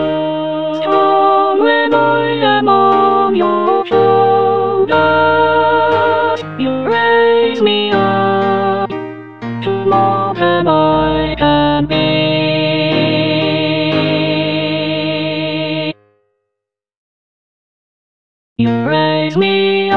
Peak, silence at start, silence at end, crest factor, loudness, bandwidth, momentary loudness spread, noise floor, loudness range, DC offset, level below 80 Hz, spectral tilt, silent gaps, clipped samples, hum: 0 dBFS; 0 s; 0 s; 12 dB; -13 LUFS; 6.4 kHz; 7 LU; -80 dBFS; 8 LU; 0.8%; -42 dBFS; -7.5 dB/octave; 16.97-18.56 s; under 0.1%; none